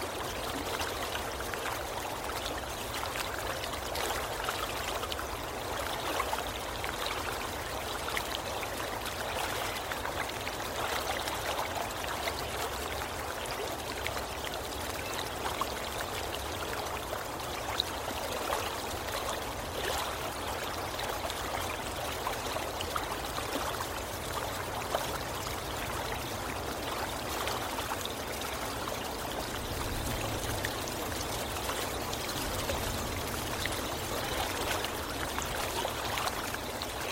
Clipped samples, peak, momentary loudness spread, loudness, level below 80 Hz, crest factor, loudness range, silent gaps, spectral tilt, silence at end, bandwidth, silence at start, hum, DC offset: under 0.1%; -12 dBFS; 3 LU; -34 LUFS; -48 dBFS; 24 dB; 2 LU; none; -3 dB/octave; 0 s; 16 kHz; 0 s; none; under 0.1%